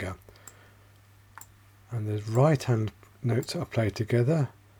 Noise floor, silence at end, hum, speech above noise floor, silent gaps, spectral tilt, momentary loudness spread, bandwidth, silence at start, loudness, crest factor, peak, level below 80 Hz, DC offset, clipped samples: -56 dBFS; 0.3 s; none; 30 dB; none; -7 dB/octave; 24 LU; 19.5 kHz; 0 s; -28 LUFS; 20 dB; -10 dBFS; -58 dBFS; under 0.1%; under 0.1%